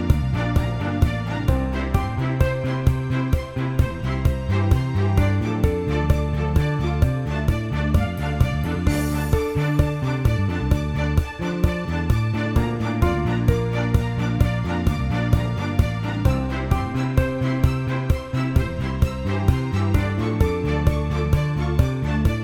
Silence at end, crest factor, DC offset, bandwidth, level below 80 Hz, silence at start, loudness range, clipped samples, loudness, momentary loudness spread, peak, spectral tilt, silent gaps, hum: 0 s; 16 dB; under 0.1%; 16.5 kHz; -26 dBFS; 0 s; 1 LU; under 0.1%; -22 LUFS; 3 LU; -4 dBFS; -7.5 dB/octave; none; none